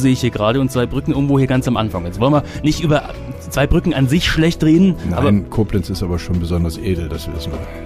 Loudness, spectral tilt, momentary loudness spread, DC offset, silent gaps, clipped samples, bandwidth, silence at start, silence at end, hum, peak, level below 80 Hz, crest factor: -17 LUFS; -6.5 dB/octave; 9 LU; under 0.1%; none; under 0.1%; 15.5 kHz; 0 s; 0 s; none; -4 dBFS; -28 dBFS; 12 dB